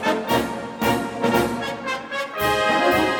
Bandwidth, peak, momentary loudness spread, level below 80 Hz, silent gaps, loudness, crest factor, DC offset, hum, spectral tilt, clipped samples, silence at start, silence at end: over 20 kHz; -6 dBFS; 9 LU; -46 dBFS; none; -22 LUFS; 16 dB; under 0.1%; none; -4.5 dB/octave; under 0.1%; 0 s; 0 s